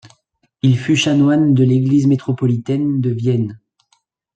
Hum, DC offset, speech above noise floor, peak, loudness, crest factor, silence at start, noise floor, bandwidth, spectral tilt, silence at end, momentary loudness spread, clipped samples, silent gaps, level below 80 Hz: none; under 0.1%; 49 dB; -4 dBFS; -16 LUFS; 12 dB; 0.65 s; -63 dBFS; 8.8 kHz; -7 dB/octave; 0.8 s; 6 LU; under 0.1%; none; -58 dBFS